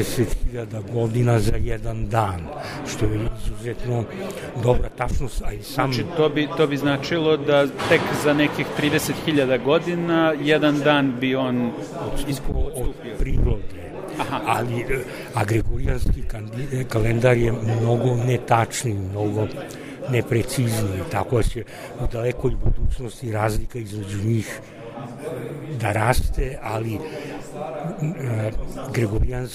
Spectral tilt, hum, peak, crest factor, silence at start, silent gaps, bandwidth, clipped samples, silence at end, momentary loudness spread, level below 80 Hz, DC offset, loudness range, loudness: -6 dB/octave; none; -2 dBFS; 20 dB; 0 s; none; 15.5 kHz; under 0.1%; 0 s; 12 LU; -30 dBFS; under 0.1%; 6 LU; -23 LUFS